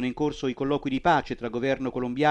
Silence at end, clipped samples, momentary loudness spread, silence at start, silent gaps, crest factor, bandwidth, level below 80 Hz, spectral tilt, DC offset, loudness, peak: 0 s; under 0.1%; 6 LU; 0 s; none; 16 dB; 8.8 kHz; -50 dBFS; -6.5 dB/octave; under 0.1%; -27 LUFS; -8 dBFS